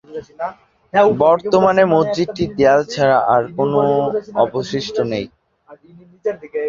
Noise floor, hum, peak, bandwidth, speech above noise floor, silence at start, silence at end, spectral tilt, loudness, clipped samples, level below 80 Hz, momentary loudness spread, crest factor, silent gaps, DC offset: -46 dBFS; none; -2 dBFS; 7.6 kHz; 30 dB; 0.1 s; 0 s; -6 dB/octave; -16 LUFS; under 0.1%; -52 dBFS; 13 LU; 16 dB; none; under 0.1%